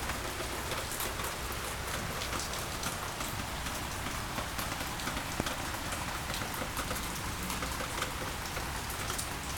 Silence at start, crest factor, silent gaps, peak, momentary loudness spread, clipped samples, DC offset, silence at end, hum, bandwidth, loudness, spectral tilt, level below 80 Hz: 0 s; 24 dB; none; -12 dBFS; 2 LU; under 0.1%; under 0.1%; 0 s; none; 19.5 kHz; -36 LUFS; -3 dB/octave; -46 dBFS